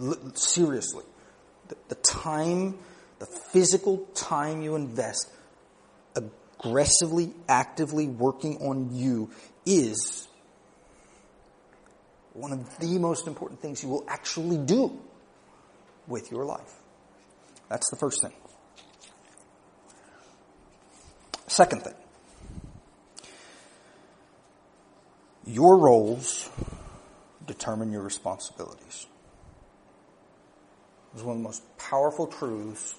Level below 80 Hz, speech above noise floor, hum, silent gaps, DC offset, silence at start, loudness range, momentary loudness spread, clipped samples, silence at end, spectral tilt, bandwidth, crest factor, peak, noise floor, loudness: -58 dBFS; 32 dB; none; none; under 0.1%; 0 s; 13 LU; 22 LU; under 0.1%; 0.05 s; -4 dB/octave; 10.5 kHz; 26 dB; -4 dBFS; -58 dBFS; -26 LUFS